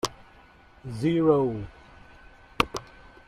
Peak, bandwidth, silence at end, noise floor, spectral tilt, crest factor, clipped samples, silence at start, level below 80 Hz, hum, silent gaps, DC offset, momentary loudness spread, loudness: -2 dBFS; 15 kHz; 0.45 s; -54 dBFS; -5.5 dB/octave; 26 dB; under 0.1%; 0.05 s; -50 dBFS; none; none; under 0.1%; 19 LU; -26 LUFS